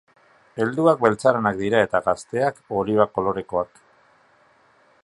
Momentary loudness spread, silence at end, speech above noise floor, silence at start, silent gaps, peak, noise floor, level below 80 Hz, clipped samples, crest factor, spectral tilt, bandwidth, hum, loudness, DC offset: 9 LU; 1.4 s; 37 dB; 0.55 s; none; 0 dBFS; -58 dBFS; -56 dBFS; under 0.1%; 22 dB; -6.5 dB/octave; 11.5 kHz; none; -21 LUFS; under 0.1%